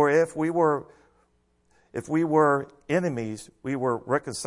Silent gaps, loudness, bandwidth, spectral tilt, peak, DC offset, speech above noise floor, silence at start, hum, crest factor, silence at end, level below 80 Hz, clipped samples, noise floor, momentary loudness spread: none; -25 LUFS; 11.5 kHz; -6 dB/octave; -8 dBFS; under 0.1%; 42 dB; 0 s; none; 18 dB; 0 s; -64 dBFS; under 0.1%; -67 dBFS; 14 LU